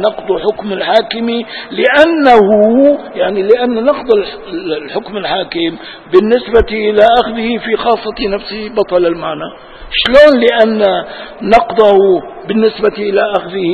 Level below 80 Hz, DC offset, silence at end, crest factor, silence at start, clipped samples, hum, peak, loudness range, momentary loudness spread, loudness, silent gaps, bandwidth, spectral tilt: -38 dBFS; 0.2%; 0 s; 12 dB; 0 s; 0.9%; none; 0 dBFS; 4 LU; 12 LU; -11 LUFS; none; 8.8 kHz; -6 dB/octave